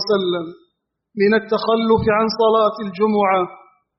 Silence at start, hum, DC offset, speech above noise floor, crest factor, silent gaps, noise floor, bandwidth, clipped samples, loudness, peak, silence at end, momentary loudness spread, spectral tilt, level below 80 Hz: 0 s; none; under 0.1%; 53 dB; 14 dB; none; -70 dBFS; 6 kHz; under 0.1%; -18 LUFS; -4 dBFS; 0.4 s; 10 LU; -4 dB/octave; -50 dBFS